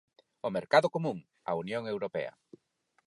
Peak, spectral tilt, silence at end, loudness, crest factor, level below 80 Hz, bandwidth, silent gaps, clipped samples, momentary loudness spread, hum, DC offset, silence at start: -10 dBFS; -6 dB/octave; 0.8 s; -32 LUFS; 24 dB; -76 dBFS; 11.5 kHz; none; under 0.1%; 13 LU; none; under 0.1%; 0.45 s